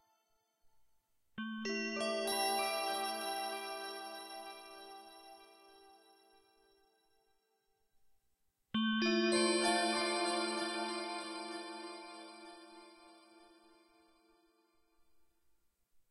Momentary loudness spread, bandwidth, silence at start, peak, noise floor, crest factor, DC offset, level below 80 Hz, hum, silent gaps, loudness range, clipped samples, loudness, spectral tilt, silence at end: 22 LU; 14 kHz; 1.35 s; -20 dBFS; -79 dBFS; 22 dB; under 0.1%; -82 dBFS; none; none; 20 LU; under 0.1%; -36 LUFS; -2.5 dB/octave; 2.65 s